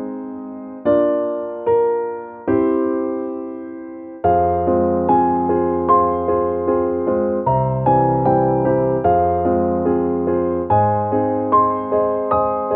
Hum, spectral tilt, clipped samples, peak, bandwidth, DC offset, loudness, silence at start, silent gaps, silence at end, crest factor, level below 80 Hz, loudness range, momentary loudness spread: none; -9.5 dB/octave; under 0.1%; -2 dBFS; 3.8 kHz; under 0.1%; -18 LUFS; 0 s; none; 0 s; 16 dB; -44 dBFS; 3 LU; 11 LU